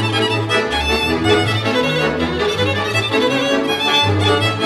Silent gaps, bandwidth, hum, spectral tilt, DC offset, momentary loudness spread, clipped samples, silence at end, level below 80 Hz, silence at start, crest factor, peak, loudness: none; 14 kHz; none; -4.5 dB/octave; under 0.1%; 3 LU; under 0.1%; 0 s; -36 dBFS; 0 s; 14 dB; -2 dBFS; -16 LUFS